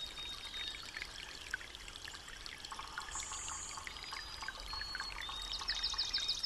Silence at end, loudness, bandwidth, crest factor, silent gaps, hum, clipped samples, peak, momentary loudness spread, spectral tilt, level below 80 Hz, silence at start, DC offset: 0 s; -41 LUFS; 15 kHz; 20 dB; none; none; under 0.1%; -24 dBFS; 12 LU; 0 dB/octave; -56 dBFS; 0 s; under 0.1%